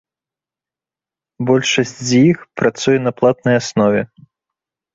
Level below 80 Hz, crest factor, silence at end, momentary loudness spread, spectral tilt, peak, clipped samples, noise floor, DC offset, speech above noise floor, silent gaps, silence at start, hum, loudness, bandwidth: -56 dBFS; 16 dB; 0.9 s; 6 LU; -5 dB/octave; -2 dBFS; under 0.1%; -89 dBFS; under 0.1%; 74 dB; none; 1.4 s; none; -15 LUFS; 7.8 kHz